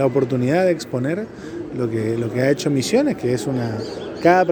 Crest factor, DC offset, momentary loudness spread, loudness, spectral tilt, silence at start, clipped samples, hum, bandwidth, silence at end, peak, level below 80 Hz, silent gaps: 18 dB; under 0.1%; 10 LU; -20 LUFS; -6 dB/octave; 0 s; under 0.1%; none; over 20 kHz; 0 s; 0 dBFS; -54 dBFS; none